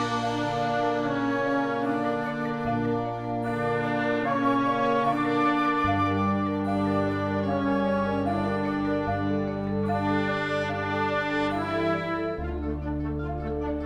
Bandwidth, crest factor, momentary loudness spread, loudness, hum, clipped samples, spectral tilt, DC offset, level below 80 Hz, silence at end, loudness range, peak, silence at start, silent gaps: 9.4 kHz; 14 dB; 6 LU; -27 LUFS; none; under 0.1%; -7 dB/octave; under 0.1%; -44 dBFS; 0 s; 3 LU; -12 dBFS; 0 s; none